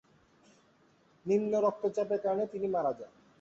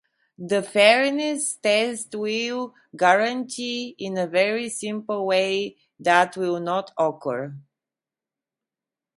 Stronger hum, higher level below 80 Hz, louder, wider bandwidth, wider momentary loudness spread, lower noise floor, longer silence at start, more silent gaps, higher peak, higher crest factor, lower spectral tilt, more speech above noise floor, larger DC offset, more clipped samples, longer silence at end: neither; about the same, -76 dBFS vs -76 dBFS; second, -32 LUFS vs -23 LUFS; second, 7.8 kHz vs 11.5 kHz; about the same, 14 LU vs 12 LU; second, -66 dBFS vs -90 dBFS; first, 1.25 s vs 0.4 s; neither; second, -16 dBFS vs -2 dBFS; second, 16 dB vs 22 dB; first, -7.5 dB/octave vs -3 dB/octave; second, 35 dB vs 67 dB; neither; neither; second, 0.35 s vs 1.6 s